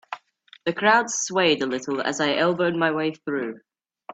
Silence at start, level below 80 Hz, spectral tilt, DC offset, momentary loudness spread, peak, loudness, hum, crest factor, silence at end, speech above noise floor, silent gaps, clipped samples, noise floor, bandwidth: 0.1 s; -68 dBFS; -3 dB/octave; under 0.1%; 11 LU; -4 dBFS; -23 LUFS; none; 20 dB; 0 s; 31 dB; none; under 0.1%; -54 dBFS; 9.2 kHz